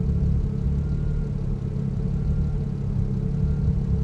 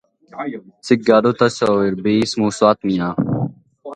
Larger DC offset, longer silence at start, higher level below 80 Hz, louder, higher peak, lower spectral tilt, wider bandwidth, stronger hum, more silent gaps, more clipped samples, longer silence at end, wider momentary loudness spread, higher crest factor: neither; second, 0 s vs 0.35 s; first, -28 dBFS vs -54 dBFS; second, -26 LUFS vs -17 LUFS; second, -12 dBFS vs 0 dBFS; first, -10.5 dB/octave vs -6 dB/octave; second, 6.2 kHz vs 10.5 kHz; neither; neither; neither; about the same, 0 s vs 0 s; second, 4 LU vs 15 LU; second, 12 dB vs 18 dB